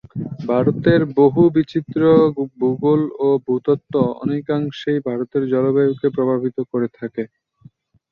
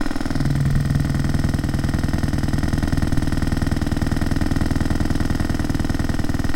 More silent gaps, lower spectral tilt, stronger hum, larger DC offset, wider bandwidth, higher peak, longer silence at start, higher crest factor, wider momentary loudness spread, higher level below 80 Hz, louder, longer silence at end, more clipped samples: neither; first, -9.5 dB/octave vs -6.5 dB/octave; neither; neither; second, 6.6 kHz vs 15.5 kHz; first, -2 dBFS vs -6 dBFS; first, 0.15 s vs 0 s; about the same, 16 dB vs 14 dB; first, 10 LU vs 3 LU; second, -54 dBFS vs -24 dBFS; first, -18 LUFS vs -22 LUFS; first, 0.85 s vs 0 s; neither